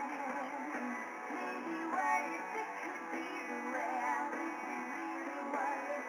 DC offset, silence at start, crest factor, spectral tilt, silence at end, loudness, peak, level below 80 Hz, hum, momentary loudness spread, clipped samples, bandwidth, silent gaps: under 0.1%; 0 s; 16 dB; -3.5 dB/octave; 0 s; -39 LUFS; -22 dBFS; under -90 dBFS; none; 6 LU; under 0.1%; over 20 kHz; none